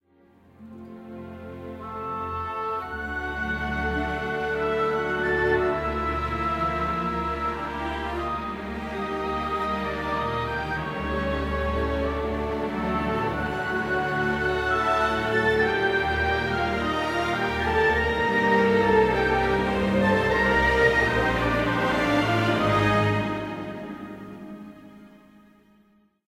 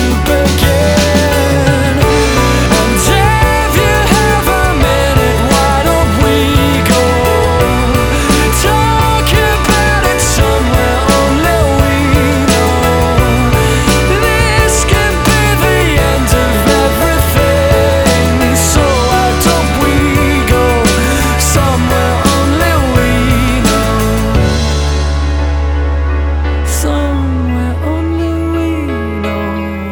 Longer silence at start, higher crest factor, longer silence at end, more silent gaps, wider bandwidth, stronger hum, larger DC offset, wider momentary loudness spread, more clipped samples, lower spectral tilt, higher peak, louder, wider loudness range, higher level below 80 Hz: first, 0.6 s vs 0 s; first, 18 dB vs 10 dB; first, 1.25 s vs 0 s; neither; second, 16 kHz vs over 20 kHz; neither; neither; first, 14 LU vs 5 LU; neither; about the same, -6 dB/octave vs -5 dB/octave; second, -8 dBFS vs 0 dBFS; second, -24 LUFS vs -10 LUFS; first, 7 LU vs 4 LU; second, -38 dBFS vs -16 dBFS